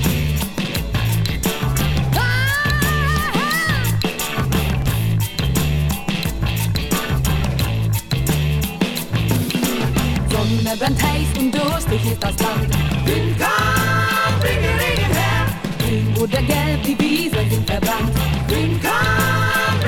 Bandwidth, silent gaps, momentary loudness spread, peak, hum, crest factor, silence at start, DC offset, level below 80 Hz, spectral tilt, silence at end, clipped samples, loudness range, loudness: 19 kHz; none; 4 LU; -2 dBFS; none; 16 dB; 0 s; under 0.1%; -28 dBFS; -5 dB/octave; 0 s; under 0.1%; 2 LU; -18 LUFS